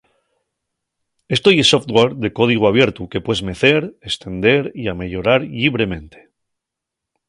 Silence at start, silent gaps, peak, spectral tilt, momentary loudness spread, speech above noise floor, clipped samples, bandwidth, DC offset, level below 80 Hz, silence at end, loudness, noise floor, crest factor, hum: 1.3 s; none; 0 dBFS; -5 dB/octave; 12 LU; 66 dB; under 0.1%; 11.5 kHz; under 0.1%; -44 dBFS; 1.2 s; -16 LUFS; -82 dBFS; 18 dB; none